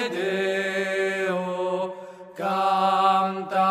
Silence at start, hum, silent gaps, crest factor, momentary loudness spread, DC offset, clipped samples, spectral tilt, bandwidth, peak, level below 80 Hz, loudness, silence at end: 0 s; none; none; 16 dB; 11 LU; under 0.1%; under 0.1%; -5 dB/octave; 15 kHz; -8 dBFS; -74 dBFS; -24 LUFS; 0 s